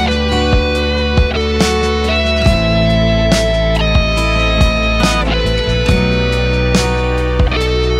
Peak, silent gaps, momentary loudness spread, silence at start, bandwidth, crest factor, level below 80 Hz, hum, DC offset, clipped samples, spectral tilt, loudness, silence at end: 0 dBFS; none; 2 LU; 0 s; 13.5 kHz; 12 dB; -18 dBFS; none; under 0.1%; under 0.1%; -5.5 dB/octave; -13 LUFS; 0 s